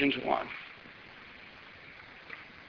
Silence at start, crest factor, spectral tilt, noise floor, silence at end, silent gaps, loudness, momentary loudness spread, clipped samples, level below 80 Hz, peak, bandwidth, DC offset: 0 s; 24 dB; -2 dB/octave; -51 dBFS; 0 s; none; -35 LUFS; 18 LU; under 0.1%; -66 dBFS; -14 dBFS; 6.4 kHz; under 0.1%